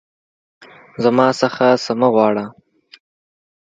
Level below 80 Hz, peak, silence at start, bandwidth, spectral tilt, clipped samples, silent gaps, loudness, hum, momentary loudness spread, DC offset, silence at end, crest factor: -64 dBFS; 0 dBFS; 1 s; 9 kHz; -5.5 dB/octave; under 0.1%; none; -16 LUFS; none; 12 LU; under 0.1%; 1.25 s; 18 dB